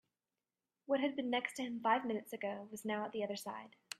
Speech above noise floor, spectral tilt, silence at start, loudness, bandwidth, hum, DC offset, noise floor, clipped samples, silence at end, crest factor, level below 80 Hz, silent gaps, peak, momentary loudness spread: over 51 dB; -4 dB/octave; 0.9 s; -39 LUFS; 15 kHz; none; under 0.1%; under -90 dBFS; under 0.1%; 0.05 s; 20 dB; -86 dBFS; none; -20 dBFS; 10 LU